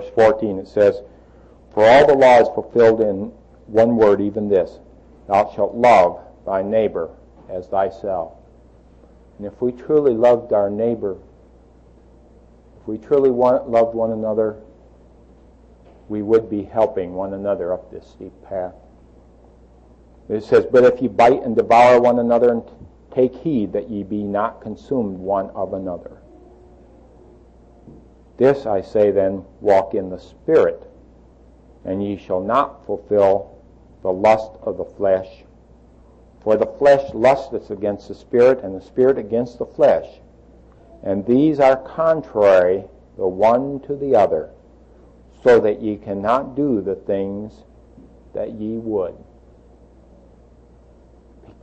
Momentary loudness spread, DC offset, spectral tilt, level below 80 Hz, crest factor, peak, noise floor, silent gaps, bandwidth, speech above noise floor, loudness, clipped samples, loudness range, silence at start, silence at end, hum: 15 LU; under 0.1%; -7 dB/octave; -50 dBFS; 18 dB; -2 dBFS; -48 dBFS; none; 8.6 kHz; 31 dB; -18 LUFS; under 0.1%; 10 LU; 0 s; 2.5 s; none